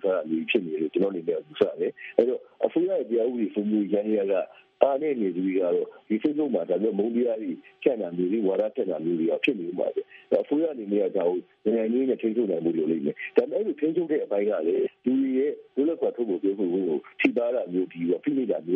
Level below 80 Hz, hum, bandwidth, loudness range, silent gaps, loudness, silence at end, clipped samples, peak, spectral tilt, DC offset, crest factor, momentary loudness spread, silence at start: -78 dBFS; none; 4.6 kHz; 1 LU; none; -26 LUFS; 0 s; under 0.1%; -2 dBFS; -5.5 dB/octave; under 0.1%; 24 dB; 4 LU; 0.05 s